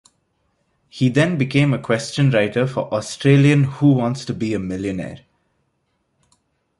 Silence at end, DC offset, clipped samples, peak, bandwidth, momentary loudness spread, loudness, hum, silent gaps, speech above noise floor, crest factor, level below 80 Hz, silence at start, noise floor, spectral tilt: 1.6 s; under 0.1%; under 0.1%; -2 dBFS; 11.5 kHz; 10 LU; -18 LUFS; none; none; 51 dB; 18 dB; -52 dBFS; 0.95 s; -69 dBFS; -6.5 dB/octave